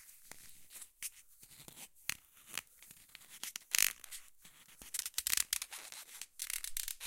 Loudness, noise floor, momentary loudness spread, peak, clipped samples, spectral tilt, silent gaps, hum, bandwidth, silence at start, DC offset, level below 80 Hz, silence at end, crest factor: -38 LUFS; -61 dBFS; 23 LU; -8 dBFS; under 0.1%; 2.5 dB/octave; none; none; 17 kHz; 0 s; under 0.1%; -66 dBFS; 0 s; 36 dB